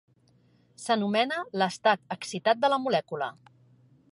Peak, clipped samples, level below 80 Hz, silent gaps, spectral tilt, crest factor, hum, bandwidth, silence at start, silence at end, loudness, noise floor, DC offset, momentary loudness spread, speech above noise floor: -10 dBFS; under 0.1%; -80 dBFS; none; -4 dB/octave; 20 dB; none; 11.5 kHz; 0.8 s; 0.85 s; -27 LUFS; -63 dBFS; under 0.1%; 10 LU; 36 dB